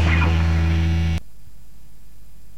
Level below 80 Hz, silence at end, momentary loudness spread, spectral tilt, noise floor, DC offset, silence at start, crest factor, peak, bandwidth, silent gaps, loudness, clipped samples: -26 dBFS; 1.4 s; 7 LU; -6.5 dB/octave; -46 dBFS; 3%; 0 s; 14 dB; -6 dBFS; 7.8 kHz; none; -20 LUFS; under 0.1%